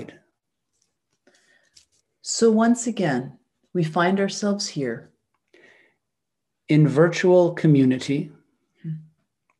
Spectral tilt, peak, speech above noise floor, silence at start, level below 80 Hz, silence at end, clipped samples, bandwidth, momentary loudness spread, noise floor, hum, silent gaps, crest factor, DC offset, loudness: -6 dB/octave; -4 dBFS; 63 dB; 0 s; -72 dBFS; 0.6 s; under 0.1%; 11 kHz; 19 LU; -83 dBFS; none; none; 18 dB; under 0.1%; -21 LUFS